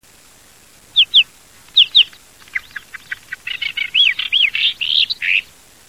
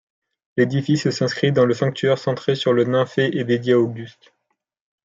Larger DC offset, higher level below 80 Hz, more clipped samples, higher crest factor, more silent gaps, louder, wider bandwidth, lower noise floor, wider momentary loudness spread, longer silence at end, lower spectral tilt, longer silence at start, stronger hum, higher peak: first, 0.2% vs under 0.1%; first, -58 dBFS vs -64 dBFS; neither; about the same, 16 dB vs 16 dB; neither; first, -13 LUFS vs -20 LUFS; first, 16 kHz vs 7.8 kHz; second, -47 dBFS vs -74 dBFS; first, 18 LU vs 5 LU; second, 0.45 s vs 0.95 s; second, 2 dB/octave vs -6.5 dB/octave; first, 0.95 s vs 0.55 s; neither; about the same, -2 dBFS vs -4 dBFS